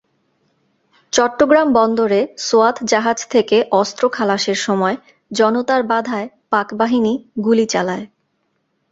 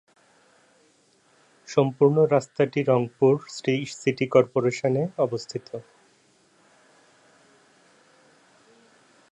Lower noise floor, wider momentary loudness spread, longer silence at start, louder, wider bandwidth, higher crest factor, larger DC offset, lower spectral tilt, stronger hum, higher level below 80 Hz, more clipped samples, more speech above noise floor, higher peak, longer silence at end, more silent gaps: first, -67 dBFS vs -62 dBFS; second, 7 LU vs 11 LU; second, 1.15 s vs 1.7 s; first, -16 LUFS vs -23 LUFS; second, 8 kHz vs 10 kHz; second, 16 dB vs 22 dB; neither; second, -4 dB/octave vs -6.5 dB/octave; neither; first, -58 dBFS vs -70 dBFS; neither; first, 52 dB vs 39 dB; about the same, -2 dBFS vs -4 dBFS; second, 0.85 s vs 3.5 s; neither